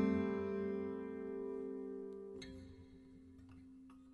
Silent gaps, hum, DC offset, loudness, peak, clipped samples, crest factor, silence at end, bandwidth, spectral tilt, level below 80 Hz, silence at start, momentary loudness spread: none; none; under 0.1%; -43 LUFS; -24 dBFS; under 0.1%; 20 dB; 0 s; 11 kHz; -8 dB/octave; -70 dBFS; 0 s; 20 LU